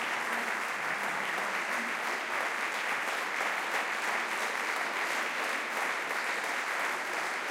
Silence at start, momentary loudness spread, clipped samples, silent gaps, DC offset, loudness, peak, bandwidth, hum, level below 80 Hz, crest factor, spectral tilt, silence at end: 0 s; 1 LU; under 0.1%; none; under 0.1%; -31 LUFS; -18 dBFS; 17 kHz; none; -88 dBFS; 16 dB; -0.5 dB/octave; 0 s